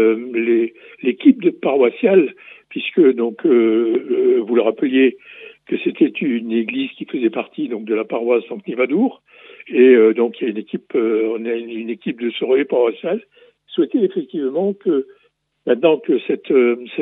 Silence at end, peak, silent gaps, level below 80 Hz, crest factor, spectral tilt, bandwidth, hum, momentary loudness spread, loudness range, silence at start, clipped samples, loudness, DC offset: 0 s; 0 dBFS; none; -80 dBFS; 16 dB; -10 dB/octave; 4 kHz; none; 11 LU; 4 LU; 0 s; under 0.1%; -18 LUFS; under 0.1%